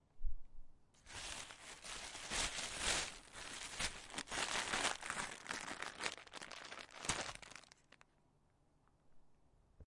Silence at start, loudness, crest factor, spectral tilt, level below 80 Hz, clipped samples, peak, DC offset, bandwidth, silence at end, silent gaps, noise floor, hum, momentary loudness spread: 0.15 s; -43 LUFS; 26 dB; -1 dB/octave; -56 dBFS; under 0.1%; -20 dBFS; under 0.1%; 11.5 kHz; 0.05 s; none; -74 dBFS; none; 15 LU